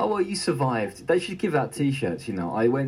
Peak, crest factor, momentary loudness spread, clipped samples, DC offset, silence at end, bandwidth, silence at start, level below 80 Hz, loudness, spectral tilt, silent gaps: -10 dBFS; 16 dB; 5 LU; under 0.1%; under 0.1%; 0 s; 15.5 kHz; 0 s; -62 dBFS; -26 LUFS; -6 dB/octave; none